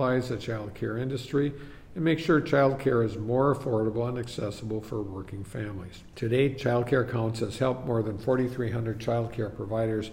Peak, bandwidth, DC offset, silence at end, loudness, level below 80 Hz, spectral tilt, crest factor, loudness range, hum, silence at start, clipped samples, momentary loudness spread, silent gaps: -12 dBFS; 16 kHz; under 0.1%; 0 s; -28 LUFS; -52 dBFS; -7.5 dB/octave; 16 dB; 4 LU; none; 0 s; under 0.1%; 12 LU; none